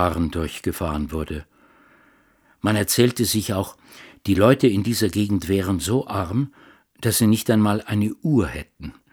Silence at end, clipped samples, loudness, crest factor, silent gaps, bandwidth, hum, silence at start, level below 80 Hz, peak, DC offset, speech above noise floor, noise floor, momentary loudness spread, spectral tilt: 0.2 s; under 0.1%; -21 LUFS; 20 dB; none; over 20 kHz; none; 0 s; -42 dBFS; -2 dBFS; under 0.1%; 38 dB; -59 dBFS; 12 LU; -5.5 dB/octave